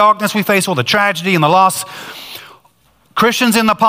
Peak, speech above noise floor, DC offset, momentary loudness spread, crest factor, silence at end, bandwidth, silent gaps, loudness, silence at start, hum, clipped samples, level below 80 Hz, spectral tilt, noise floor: 0 dBFS; 41 dB; under 0.1%; 17 LU; 14 dB; 0 s; 16 kHz; none; -13 LUFS; 0 s; none; under 0.1%; -56 dBFS; -4 dB/octave; -53 dBFS